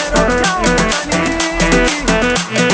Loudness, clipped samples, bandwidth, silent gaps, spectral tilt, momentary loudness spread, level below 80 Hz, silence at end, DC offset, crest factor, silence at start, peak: -13 LUFS; under 0.1%; 8 kHz; none; -3.5 dB/octave; 3 LU; -26 dBFS; 0 s; under 0.1%; 14 dB; 0 s; 0 dBFS